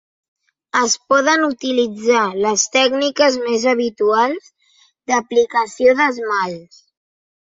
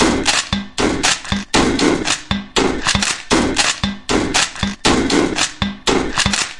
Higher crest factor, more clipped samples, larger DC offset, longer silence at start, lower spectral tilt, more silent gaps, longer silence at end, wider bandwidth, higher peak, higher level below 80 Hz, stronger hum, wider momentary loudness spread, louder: about the same, 16 dB vs 16 dB; neither; neither; first, 0.75 s vs 0 s; about the same, -2 dB/octave vs -3 dB/octave; neither; first, 0.85 s vs 0 s; second, 7.8 kHz vs 11.5 kHz; about the same, -2 dBFS vs 0 dBFS; second, -64 dBFS vs -32 dBFS; neither; about the same, 6 LU vs 5 LU; about the same, -16 LUFS vs -16 LUFS